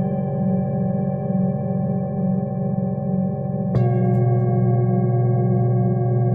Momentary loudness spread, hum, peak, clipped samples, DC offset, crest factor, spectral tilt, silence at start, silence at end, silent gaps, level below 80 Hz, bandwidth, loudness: 5 LU; none; -8 dBFS; under 0.1%; under 0.1%; 12 dB; -13.5 dB/octave; 0 s; 0 s; none; -48 dBFS; 2.5 kHz; -21 LUFS